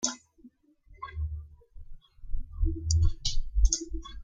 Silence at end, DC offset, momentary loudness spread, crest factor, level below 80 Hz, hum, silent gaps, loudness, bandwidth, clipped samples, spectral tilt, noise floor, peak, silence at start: 0 s; under 0.1%; 17 LU; 20 dB; -32 dBFS; none; none; -31 LUFS; 9.4 kHz; under 0.1%; -3.5 dB/octave; -58 dBFS; -10 dBFS; 0 s